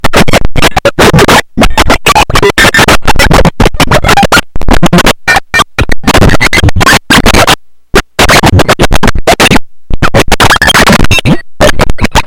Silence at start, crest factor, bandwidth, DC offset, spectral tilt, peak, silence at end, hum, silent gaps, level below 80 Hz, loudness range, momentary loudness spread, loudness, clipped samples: 0.05 s; 4 dB; over 20 kHz; under 0.1%; -4 dB/octave; 0 dBFS; 0 s; none; none; -12 dBFS; 1 LU; 6 LU; -5 LUFS; 9%